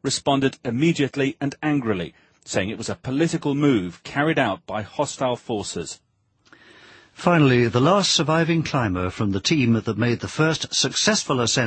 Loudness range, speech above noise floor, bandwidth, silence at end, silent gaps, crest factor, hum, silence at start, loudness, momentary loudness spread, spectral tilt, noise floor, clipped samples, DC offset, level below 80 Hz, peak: 5 LU; 35 dB; 8.8 kHz; 0 s; none; 20 dB; none; 0.05 s; -22 LUFS; 10 LU; -4.5 dB/octave; -57 dBFS; under 0.1%; under 0.1%; -54 dBFS; -2 dBFS